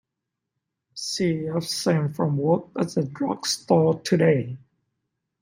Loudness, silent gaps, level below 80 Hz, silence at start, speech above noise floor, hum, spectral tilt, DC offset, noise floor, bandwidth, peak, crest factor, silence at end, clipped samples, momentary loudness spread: -24 LUFS; none; -66 dBFS; 0.95 s; 61 dB; none; -5.5 dB/octave; under 0.1%; -83 dBFS; 16 kHz; -4 dBFS; 20 dB; 0.85 s; under 0.1%; 10 LU